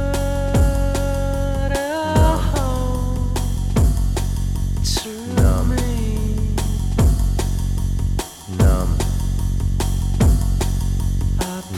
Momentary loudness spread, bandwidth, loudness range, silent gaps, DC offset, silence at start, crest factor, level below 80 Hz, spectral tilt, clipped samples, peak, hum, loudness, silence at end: 6 LU; 16 kHz; 1 LU; none; under 0.1%; 0 s; 14 dB; -20 dBFS; -6 dB/octave; under 0.1%; -4 dBFS; none; -20 LUFS; 0 s